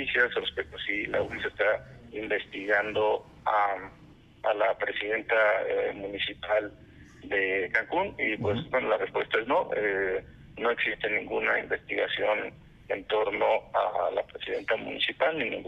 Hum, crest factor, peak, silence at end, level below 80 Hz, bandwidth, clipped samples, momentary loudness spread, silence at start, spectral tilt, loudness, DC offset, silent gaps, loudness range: none; 20 dB; -10 dBFS; 0 s; -60 dBFS; 7.8 kHz; under 0.1%; 7 LU; 0 s; -6 dB/octave; -28 LUFS; under 0.1%; none; 1 LU